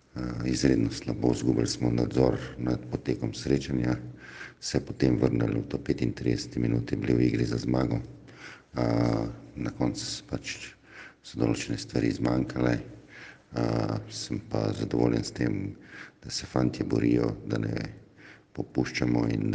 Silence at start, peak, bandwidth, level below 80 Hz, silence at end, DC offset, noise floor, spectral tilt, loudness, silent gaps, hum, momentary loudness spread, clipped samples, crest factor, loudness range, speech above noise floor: 0.15 s; -8 dBFS; 9.6 kHz; -48 dBFS; 0 s; under 0.1%; -53 dBFS; -6.5 dB/octave; -29 LUFS; none; none; 16 LU; under 0.1%; 20 dB; 3 LU; 25 dB